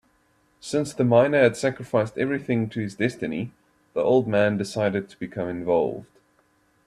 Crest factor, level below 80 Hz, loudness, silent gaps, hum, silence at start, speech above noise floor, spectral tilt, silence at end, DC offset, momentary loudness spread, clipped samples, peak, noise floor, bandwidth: 20 dB; -62 dBFS; -24 LUFS; none; none; 0.65 s; 41 dB; -6.5 dB/octave; 0.8 s; under 0.1%; 13 LU; under 0.1%; -4 dBFS; -64 dBFS; 13 kHz